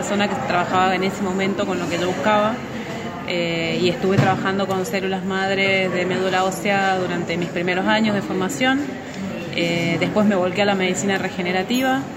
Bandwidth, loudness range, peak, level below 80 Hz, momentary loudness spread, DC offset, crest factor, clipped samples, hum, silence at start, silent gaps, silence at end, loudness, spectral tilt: 16 kHz; 1 LU; -4 dBFS; -54 dBFS; 6 LU; under 0.1%; 16 dB; under 0.1%; none; 0 s; none; 0 s; -20 LUFS; -5 dB/octave